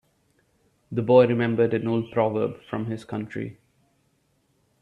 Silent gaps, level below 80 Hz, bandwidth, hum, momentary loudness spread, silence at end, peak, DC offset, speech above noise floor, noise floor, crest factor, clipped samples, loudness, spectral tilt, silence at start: none; -64 dBFS; 7 kHz; none; 15 LU; 1.3 s; -4 dBFS; under 0.1%; 45 dB; -68 dBFS; 22 dB; under 0.1%; -24 LUFS; -9 dB/octave; 0.9 s